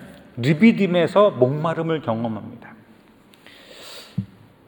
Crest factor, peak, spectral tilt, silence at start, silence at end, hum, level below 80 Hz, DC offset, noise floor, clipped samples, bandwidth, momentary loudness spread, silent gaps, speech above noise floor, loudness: 20 dB; -2 dBFS; -7.5 dB/octave; 0 s; 0.4 s; none; -64 dBFS; under 0.1%; -51 dBFS; under 0.1%; 19 kHz; 23 LU; none; 33 dB; -19 LUFS